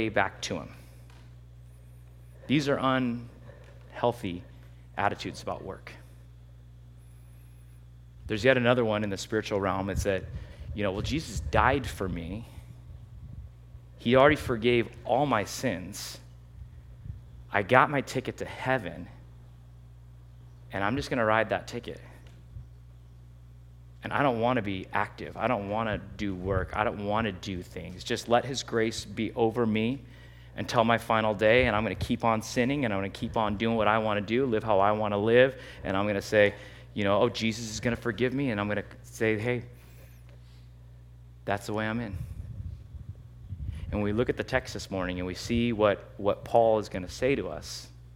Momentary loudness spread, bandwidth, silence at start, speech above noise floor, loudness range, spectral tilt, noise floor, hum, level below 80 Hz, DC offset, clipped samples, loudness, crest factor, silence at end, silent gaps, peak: 21 LU; 16.5 kHz; 0 s; 22 dB; 8 LU; -5.5 dB/octave; -50 dBFS; 60 Hz at -50 dBFS; -48 dBFS; under 0.1%; under 0.1%; -28 LUFS; 28 dB; 0.05 s; none; -2 dBFS